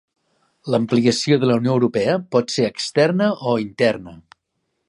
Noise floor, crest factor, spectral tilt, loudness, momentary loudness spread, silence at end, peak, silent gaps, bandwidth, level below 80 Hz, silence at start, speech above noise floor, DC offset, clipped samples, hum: -74 dBFS; 16 dB; -5.5 dB/octave; -19 LUFS; 5 LU; 0.7 s; -2 dBFS; none; 11.5 kHz; -60 dBFS; 0.65 s; 55 dB; under 0.1%; under 0.1%; none